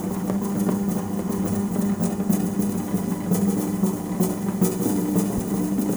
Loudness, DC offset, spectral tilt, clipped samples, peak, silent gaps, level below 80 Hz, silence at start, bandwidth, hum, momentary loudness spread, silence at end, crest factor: -24 LUFS; under 0.1%; -7 dB/octave; under 0.1%; -8 dBFS; none; -48 dBFS; 0 s; over 20 kHz; none; 3 LU; 0 s; 16 dB